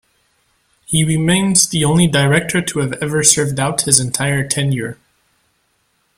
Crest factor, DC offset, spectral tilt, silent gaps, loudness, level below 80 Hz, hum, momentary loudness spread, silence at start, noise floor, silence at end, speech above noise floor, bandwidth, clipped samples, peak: 16 dB; under 0.1%; -3.5 dB/octave; none; -14 LUFS; -46 dBFS; none; 8 LU; 0.9 s; -63 dBFS; 1.25 s; 48 dB; 16.5 kHz; under 0.1%; 0 dBFS